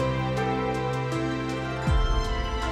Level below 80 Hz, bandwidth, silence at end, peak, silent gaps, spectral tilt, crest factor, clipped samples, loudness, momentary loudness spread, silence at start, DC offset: -30 dBFS; 12 kHz; 0 s; -12 dBFS; none; -6 dB/octave; 14 dB; under 0.1%; -28 LUFS; 3 LU; 0 s; under 0.1%